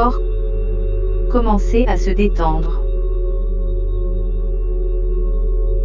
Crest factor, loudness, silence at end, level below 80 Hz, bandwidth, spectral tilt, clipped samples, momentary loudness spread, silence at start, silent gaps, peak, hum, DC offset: 14 dB; -20 LUFS; 0 s; -16 dBFS; 7 kHz; -8 dB/octave; under 0.1%; 6 LU; 0 s; none; -2 dBFS; none; under 0.1%